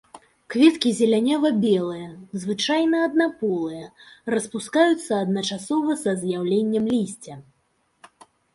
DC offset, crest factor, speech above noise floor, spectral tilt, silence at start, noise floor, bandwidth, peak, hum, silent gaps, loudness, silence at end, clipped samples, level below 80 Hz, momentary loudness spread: under 0.1%; 18 dB; 46 dB; -5 dB/octave; 0.15 s; -68 dBFS; 11.5 kHz; -4 dBFS; none; none; -22 LUFS; 1.15 s; under 0.1%; -66 dBFS; 13 LU